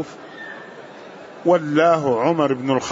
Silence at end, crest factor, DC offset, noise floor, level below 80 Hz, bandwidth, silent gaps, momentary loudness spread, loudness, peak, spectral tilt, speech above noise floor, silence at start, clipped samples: 0 s; 16 dB; under 0.1%; -39 dBFS; -66 dBFS; 7.8 kHz; none; 22 LU; -18 LUFS; -4 dBFS; -6 dB/octave; 21 dB; 0 s; under 0.1%